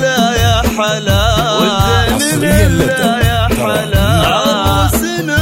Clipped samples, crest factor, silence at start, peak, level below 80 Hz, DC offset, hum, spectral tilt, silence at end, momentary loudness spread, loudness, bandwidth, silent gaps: under 0.1%; 12 dB; 0 s; 0 dBFS; -22 dBFS; under 0.1%; none; -4.5 dB/octave; 0 s; 3 LU; -12 LUFS; 16.5 kHz; none